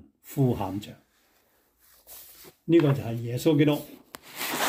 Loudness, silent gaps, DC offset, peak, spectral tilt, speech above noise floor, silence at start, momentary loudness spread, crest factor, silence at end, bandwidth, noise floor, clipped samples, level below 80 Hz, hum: -26 LUFS; none; under 0.1%; -10 dBFS; -6 dB/octave; 42 dB; 0.25 s; 23 LU; 18 dB; 0 s; 16 kHz; -66 dBFS; under 0.1%; -62 dBFS; none